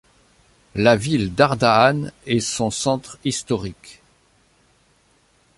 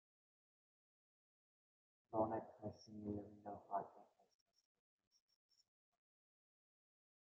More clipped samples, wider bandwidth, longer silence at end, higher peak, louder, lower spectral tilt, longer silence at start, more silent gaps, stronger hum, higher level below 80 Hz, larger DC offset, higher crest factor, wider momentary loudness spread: neither; first, 11.5 kHz vs 7.2 kHz; second, 1.65 s vs 3.3 s; first, -2 dBFS vs -28 dBFS; first, -19 LUFS vs -48 LUFS; second, -4.5 dB/octave vs -7.5 dB/octave; second, 0.75 s vs 2.1 s; neither; neither; first, -50 dBFS vs -90 dBFS; neither; second, 20 dB vs 26 dB; about the same, 11 LU vs 13 LU